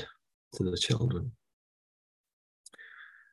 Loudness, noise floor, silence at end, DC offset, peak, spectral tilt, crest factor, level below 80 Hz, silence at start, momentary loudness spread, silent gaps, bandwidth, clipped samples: -32 LUFS; -53 dBFS; 0.25 s; under 0.1%; -14 dBFS; -5 dB/octave; 22 dB; -54 dBFS; 0 s; 22 LU; 0.34-0.51 s, 1.53-2.24 s, 2.33-2.64 s; 12 kHz; under 0.1%